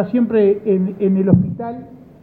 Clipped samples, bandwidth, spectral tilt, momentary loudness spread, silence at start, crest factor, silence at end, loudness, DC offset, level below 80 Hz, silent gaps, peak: under 0.1%; 4.2 kHz; -12.5 dB/octave; 13 LU; 0 s; 16 dB; 0.25 s; -16 LUFS; under 0.1%; -46 dBFS; none; 0 dBFS